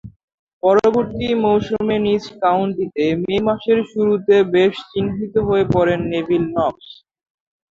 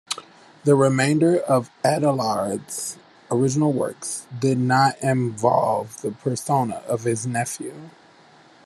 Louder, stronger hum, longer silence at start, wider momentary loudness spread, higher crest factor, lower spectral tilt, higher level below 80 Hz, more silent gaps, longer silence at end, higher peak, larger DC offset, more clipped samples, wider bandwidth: first, -18 LUFS vs -22 LUFS; neither; about the same, 0.05 s vs 0.1 s; second, 6 LU vs 12 LU; about the same, 16 dB vs 18 dB; first, -7.5 dB/octave vs -5.5 dB/octave; first, -46 dBFS vs -64 dBFS; first, 0.16-0.28 s, 0.34-0.47 s, 0.53-0.61 s vs none; about the same, 0.85 s vs 0.75 s; about the same, -2 dBFS vs -4 dBFS; neither; neither; second, 7.4 kHz vs 13.5 kHz